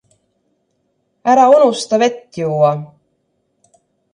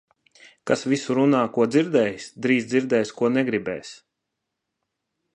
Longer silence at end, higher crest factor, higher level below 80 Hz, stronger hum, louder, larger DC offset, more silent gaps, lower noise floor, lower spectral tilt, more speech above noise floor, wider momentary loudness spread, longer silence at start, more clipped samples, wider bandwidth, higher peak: second, 1.25 s vs 1.4 s; about the same, 16 dB vs 18 dB; about the same, -66 dBFS vs -68 dBFS; neither; first, -14 LUFS vs -22 LUFS; neither; neither; second, -66 dBFS vs -81 dBFS; about the same, -5.5 dB/octave vs -5.5 dB/octave; second, 53 dB vs 59 dB; first, 13 LU vs 10 LU; first, 1.25 s vs 0.65 s; neither; about the same, 11 kHz vs 10.5 kHz; first, 0 dBFS vs -6 dBFS